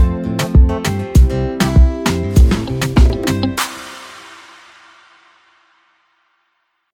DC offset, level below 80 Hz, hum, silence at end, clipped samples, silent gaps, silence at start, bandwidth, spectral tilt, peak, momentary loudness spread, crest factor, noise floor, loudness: under 0.1%; -18 dBFS; none; 2.6 s; under 0.1%; none; 0 s; 16.5 kHz; -6 dB/octave; 0 dBFS; 18 LU; 16 dB; -66 dBFS; -15 LUFS